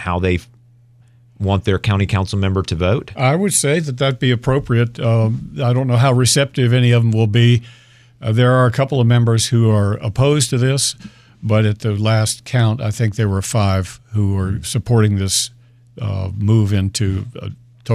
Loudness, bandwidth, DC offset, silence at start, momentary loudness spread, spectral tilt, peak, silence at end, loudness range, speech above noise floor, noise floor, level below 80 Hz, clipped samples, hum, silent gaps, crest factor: -16 LUFS; 14 kHz; under 0.1%; 0 s; 8 LU; -5.5 dB/octave; -2 dBFS; 0 s; 4 LU; 33 dB; -49 dBFS; -42 dBFS; under 0.1%; none; none; 14 dB